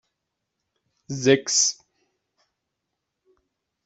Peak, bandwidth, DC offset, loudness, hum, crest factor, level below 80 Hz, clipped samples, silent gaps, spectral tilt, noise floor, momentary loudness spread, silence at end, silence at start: -4 dBFS; 8.2 kHz; under 0.1%; -20 LUFS; none; 24 dB; -70 dBFS; under 0.1%; none; -2.5 dB/octave; -81 dBFS; 18 LU; 2.15 s; 1.1 s